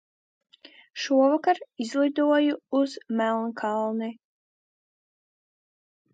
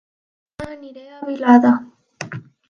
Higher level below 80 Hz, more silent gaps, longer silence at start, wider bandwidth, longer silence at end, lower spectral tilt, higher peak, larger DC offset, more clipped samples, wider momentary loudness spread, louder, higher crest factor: second, -84 dBFS vs -58 dBFS; neither; first, 0.95 s vs 0.6 s; first, 9 kHz vs 7.2 kHz; first, 2 s vs 0.3 s; second, -4.5 dB/octave vs -6.5 dB/octave; second, -10 dBFS vs 0 dBFS; neither; neither; second, 10 LU vs 23 LU; second, -25 LUFS vs -15 LUFS; about the same, 18 dB vs 20 dB